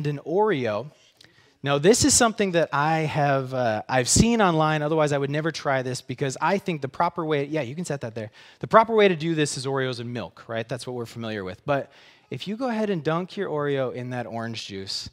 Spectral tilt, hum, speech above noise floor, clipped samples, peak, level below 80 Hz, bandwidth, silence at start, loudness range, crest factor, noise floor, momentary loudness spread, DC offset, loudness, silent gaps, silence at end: -4.5 dB/octave; none; 32 dB; under 0.1%; 0 dBFS; -50 dBFS; 16 kHz; 0 s; 8 LU; 24 dB; -56 dBFS; 14 LU; under 0.1%; -24 LUFS; none; 0.05 s